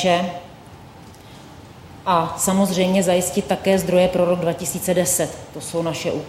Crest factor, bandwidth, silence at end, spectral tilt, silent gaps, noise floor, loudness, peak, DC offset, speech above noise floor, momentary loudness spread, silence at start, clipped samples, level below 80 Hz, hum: 16 dB; 16 kHz; 0 s; -4.5 dB/octave; none; -42 dBFS; -20 LUFS; -4 dBFS; under 0.1%; 22 dB; 10 LU; 0 s; under 0.1%; -50 dBFS; none